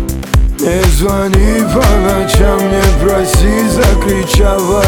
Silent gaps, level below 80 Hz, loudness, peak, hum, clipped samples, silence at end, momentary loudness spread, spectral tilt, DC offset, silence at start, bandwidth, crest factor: none; -14 dBFS; -11 LUFS; 0 dBFS; none; under 0.1%; 0 s; 3 LU; -5.5 dB/octave; under 0.1%; 0 s; 19 kHz; 10 dB